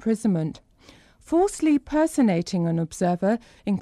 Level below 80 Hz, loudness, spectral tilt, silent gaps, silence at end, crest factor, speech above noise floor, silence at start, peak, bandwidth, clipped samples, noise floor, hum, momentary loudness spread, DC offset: -52 dBFS; -24 LUFS; -7 dB/octave; none; 0 s; 12 dB; 30 dB; 0 s; -12 dBFS; 13.5 kHz; under 0.1%; -53 dBFS; none; 6 LU; under 0.1%